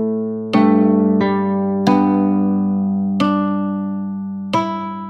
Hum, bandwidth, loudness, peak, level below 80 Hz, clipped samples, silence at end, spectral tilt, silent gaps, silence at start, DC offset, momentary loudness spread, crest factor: none; 7 kHz; -17 LUFS; -2 dBFS; -60 dBFS; under 0.1%; 0 s; -8.5 dB/octave; none; 0 s; under 0.1%; 9 LU; 16 dB